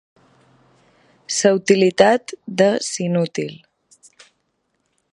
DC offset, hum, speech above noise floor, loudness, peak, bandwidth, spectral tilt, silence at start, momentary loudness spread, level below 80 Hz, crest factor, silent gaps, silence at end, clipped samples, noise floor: under 0.1%; none; 53 dB; -18 LUFS; 0 dBFS; 11.5 kHz; -4.5 dB/octave; 1.3 s; 12 LU; -66 dBFS; 20 dB; none; 1.6 s; under 0.1%; -70 dBFS